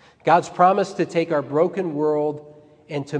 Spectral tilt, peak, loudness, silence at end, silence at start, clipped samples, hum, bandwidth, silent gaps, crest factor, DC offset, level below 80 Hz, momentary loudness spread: -6.5 dB/octave; -2 dBFS; -21 LUFS; 0 s; 0.25 s; under 0.1%; none; 10 kHz; none; 18 dB; under 0.1%; -70 dBFS; 12 LU